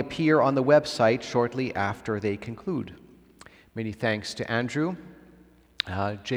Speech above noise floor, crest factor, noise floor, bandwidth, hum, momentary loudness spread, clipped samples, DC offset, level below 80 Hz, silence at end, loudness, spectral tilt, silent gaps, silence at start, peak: 30 dB; 22 dB; -55 dBFS; 13 kHz; none; 13 LU; under 0.1%; under 0.1%; -60 dBFS; 0 s; -26 LUFS; -6 dB/octave; none; 0 s; -4 dBFS